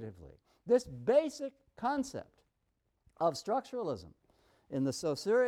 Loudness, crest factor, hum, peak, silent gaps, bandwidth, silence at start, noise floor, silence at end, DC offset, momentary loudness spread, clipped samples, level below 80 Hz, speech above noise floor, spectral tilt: -34 LUFS; 18 dB; none; -16 dBFS; none; 14 kHz; 0 s; -80 dBFS; 0 s; under 0.1%; 14 LU; under 0.1%; -68 dBFS; 47 dB; -5.5 dB/octave